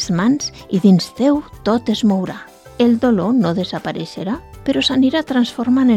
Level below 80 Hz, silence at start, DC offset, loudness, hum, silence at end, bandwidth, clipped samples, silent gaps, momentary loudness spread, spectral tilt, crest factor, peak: -46 dBFS; 0 s; under 0.1%; -17 LUFS; none; 0 s; 12.5 kHz; under 0.1%; none; 11 LU; -6 dB/octave; 16 dB; 0 dBFS